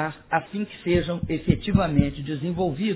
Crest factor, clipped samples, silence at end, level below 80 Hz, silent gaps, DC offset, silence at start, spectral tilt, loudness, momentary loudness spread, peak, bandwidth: 20 dB; under 0.1%; 0 s; -38 dBFS; none; under 0.1%; 0 s; -11.5 dB/octave; -25 LUFS; 8 LU; -4 dBFS; 4 kHz